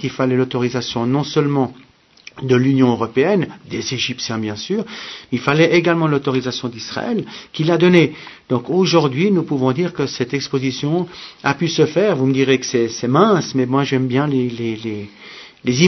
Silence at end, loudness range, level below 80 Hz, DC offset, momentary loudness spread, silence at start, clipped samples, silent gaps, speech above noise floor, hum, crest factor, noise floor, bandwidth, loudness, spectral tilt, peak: 0 s; 2 LU; -58 dBFS; under 0.1%; 11 LU; 0 s; under 0.1%; none; 27 dB; none; 18 dB; -44 dBFS; 6.2 kHz; -18 LUFS; -6 dB/octave; 0 dBFS